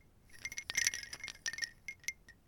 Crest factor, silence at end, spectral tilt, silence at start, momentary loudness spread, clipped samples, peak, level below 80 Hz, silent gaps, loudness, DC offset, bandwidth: 28 dB; 0.15 s; 1.5 dB/octave; 0.25 s; 11 LU; under 0.1%; -14 dBFS; -66 dBFS; none; -39 LUFS; under 0.1%; 19 kHz